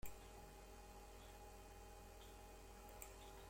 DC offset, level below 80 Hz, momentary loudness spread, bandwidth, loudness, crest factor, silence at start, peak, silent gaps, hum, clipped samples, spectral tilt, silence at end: under 0.1%; -62 dBFS; 3 LU; 16.5 kHz; -60 LUFS; 22 dB; 0 s; -36 dBFS; none; none; under 0.1%; -3.5 dB/octave; 0 s